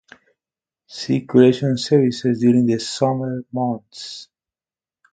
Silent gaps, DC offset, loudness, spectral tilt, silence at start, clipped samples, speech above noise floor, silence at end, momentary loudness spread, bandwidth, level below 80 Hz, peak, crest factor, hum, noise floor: none; under 0.1%; -18 LUFS; -6.5 dB/octave; 0.9 s; under 0.1%; over 72 dB; 0.9 s; 18 LU; 9.2 kHz; -62 dBFS; 0 dBFS; 20 dB; none; under -90 dBFS